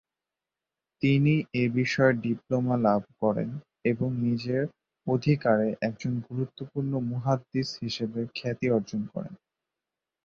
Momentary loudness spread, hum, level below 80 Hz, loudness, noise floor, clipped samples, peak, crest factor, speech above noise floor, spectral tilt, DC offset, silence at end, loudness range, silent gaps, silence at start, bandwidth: 10 LU; none; -62 dBFS; -28 LUFS; -89 dBFS; under 0.1%; -8 dBFS; 20 dB; 62 dB; -7.5 dB/octave; under 0.1%; 0.9 s; 5 LU; none; 1 s; 7.2 kHz